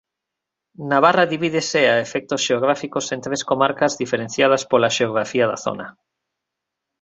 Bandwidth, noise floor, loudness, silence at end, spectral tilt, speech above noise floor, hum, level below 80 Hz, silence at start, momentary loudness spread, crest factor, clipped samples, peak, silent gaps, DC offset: 8.2 kHz; -83 dBFS; -19 LUFS; 1.1 s; -3.5 dB/octave; 64 dB; none; -62 dBFS; 0.8 s; 9 LU; 20 dB; under 0.1%; -2 dBFS; none; under 0.1%